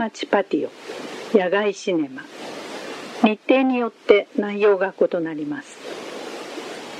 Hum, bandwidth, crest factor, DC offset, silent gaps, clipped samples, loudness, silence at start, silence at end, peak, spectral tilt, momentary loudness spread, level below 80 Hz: none; 12.5 kHz; 22 dB; under 0.1%; none; under 0.1%; -21 LUFS; 0 s; 0 s; 0 dBFS; -5 dB/octave; 15 LU; -72 dBFS